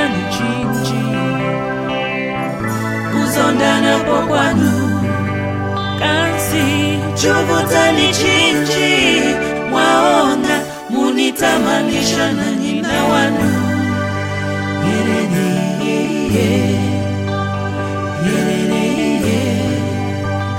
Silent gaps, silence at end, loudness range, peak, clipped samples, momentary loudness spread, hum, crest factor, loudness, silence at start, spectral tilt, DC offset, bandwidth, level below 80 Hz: none; 0 s; 4 LU; 0 dBFS; under 0.1%; 8 LU; none; 14 dB; -15 LUFS; 0 s; -4.5 dB/octave; under 0.1%; 16.5 kHz; -44 dBFS